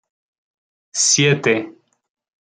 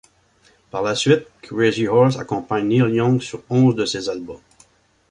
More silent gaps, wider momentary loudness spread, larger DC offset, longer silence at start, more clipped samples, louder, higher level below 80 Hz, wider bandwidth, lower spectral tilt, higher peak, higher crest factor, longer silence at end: neither; about the same, 14 LU vs 12 LU; neither; first, 0.95 s vs 0.75 s; neither; first, -16 LUFS vs -19 LUFS; second, -64 dBFS vs -56 dBFS; about the same, 10.5 kHz vs 10.5 kHz; second, -2.5 dB/octave vs -6 dB/octave; about the same, -2 dBFS vs -2 dBFS; about the same, 18 dB vs 18 dB; about the same, 0.75 s vs 0.75 s